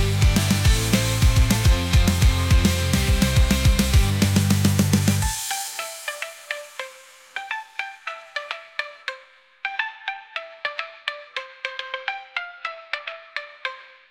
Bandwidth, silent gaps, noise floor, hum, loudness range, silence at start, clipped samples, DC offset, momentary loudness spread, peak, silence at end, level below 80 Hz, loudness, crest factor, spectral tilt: 17 kHz; none; -49 dBFS; none; 12 LU; 0 s; under 0.1%; under 0.1%; 14 LU; -6 dBFS; 0.3 s; -26 dBFS; -23 LUFS; 16 dB; -4.5 dB/octave